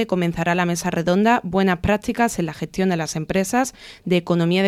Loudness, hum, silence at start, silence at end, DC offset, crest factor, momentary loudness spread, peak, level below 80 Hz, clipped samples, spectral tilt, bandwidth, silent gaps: -21 LUFS; none; 0 s; 0 s; under 0.1%; 16 dB; 6 LU; -4 dBFS; -44 dBFS; under 0.1%; -5.5 dB/octave; 15 kHz; none